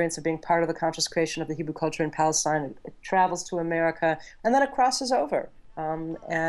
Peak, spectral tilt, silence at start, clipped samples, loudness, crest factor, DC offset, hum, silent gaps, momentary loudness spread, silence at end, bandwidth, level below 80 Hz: -10 dBFS; -3.5 dB/octave; 0 s; under 0.1%; -26 LUFS; 16 dB; under 0.1%; none; none; 9 LU; 0 s; 12.5 kHz; -58 dBFS